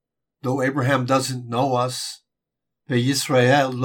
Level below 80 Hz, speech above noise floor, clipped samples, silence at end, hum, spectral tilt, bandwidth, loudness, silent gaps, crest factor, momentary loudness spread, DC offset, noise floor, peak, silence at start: -70 dBFS; 62 dB; under 0.1%; 0 s; none; -5 dB/octave; 18.5 kHz; -21 LUFS; none; 16 dB; 12 LU; under 0.1%; -82 dBFS; -4 dBFS; 0.45 s